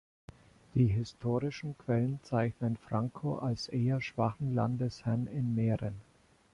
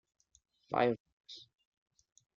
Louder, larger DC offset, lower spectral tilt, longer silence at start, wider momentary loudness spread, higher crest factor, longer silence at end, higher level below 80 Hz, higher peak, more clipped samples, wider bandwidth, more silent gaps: about the same, -33 LUFS vs -34 LUFS; neither; first, -8 dB/octave vs -4 dB/octave; about the same, 0.75 s vs 0.7 s; second, 6 LU vs 20 LU; second, 16 dB vs 22 dB; second, 0.5 s vs 1 s; first, -58 dBFS vs -78 dBFS; about the same, -16 dBFS vs -18 dBFS; neither; first, 10.5 kHz vs 7.4 kHz; second, none vs 1.00-1.05 s, 1.13-1.24 s